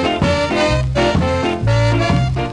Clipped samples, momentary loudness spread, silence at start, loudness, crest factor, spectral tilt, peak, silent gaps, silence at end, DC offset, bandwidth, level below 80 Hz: under 0.1%; 2 LU; 0 s; -16 LUFS; 14 dB; -6 dB/octave; -2 dBFS; none; 0 s; under 0.1%; 10.5 kHz; -26 dBFS